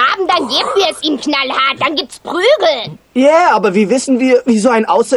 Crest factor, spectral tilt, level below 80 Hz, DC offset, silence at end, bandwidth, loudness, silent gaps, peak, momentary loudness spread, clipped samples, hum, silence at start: 12 dB; -3.5 dB/octave; -54 dBFS; under 0.1%; 0 s; 12.5 kHz; -12 LUFS; none; 0 dBFS; 6 LU; under 0.1%; none; 0 s